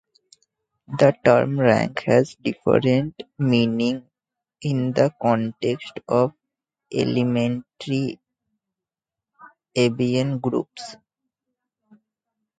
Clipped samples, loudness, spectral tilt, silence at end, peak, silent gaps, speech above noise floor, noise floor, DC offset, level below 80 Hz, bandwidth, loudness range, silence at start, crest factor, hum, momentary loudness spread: under 0.1%; -22 LUFS; -7 dB/octave; 1.65 s; -2 dBFS; none; 68 dB; -88 dBFS; under 0.1%; -60 dBFS; 9.2 kHz; 7 LU; 0.9 s; 20 dB; none; 13 LU